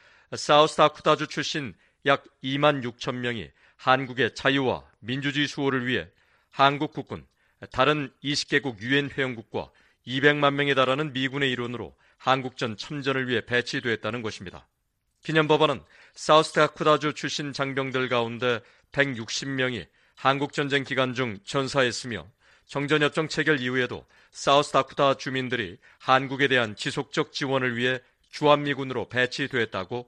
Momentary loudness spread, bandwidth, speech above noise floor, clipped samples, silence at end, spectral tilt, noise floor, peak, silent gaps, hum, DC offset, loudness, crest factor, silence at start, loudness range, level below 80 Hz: 13 LU; 11 kHz; 49 dB; under 0.1%; 0.05 s; -4.5 dB/octave; -75 dBFS; -4 dBFS; none; none; under 0.1%; -25 LUFS; 22 dB; 0.3 s; 3 LU; -62 dBFS